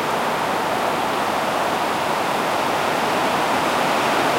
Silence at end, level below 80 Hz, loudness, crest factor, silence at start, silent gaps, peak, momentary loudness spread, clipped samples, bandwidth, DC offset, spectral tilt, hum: 0 s; -54 dBFS; -20 LUFS; 14 dB; 0 s; none; -6 dBFS; 2 LU; under 0.1%; 16 kHz; under 0.1%; -3.5 dB/octave; none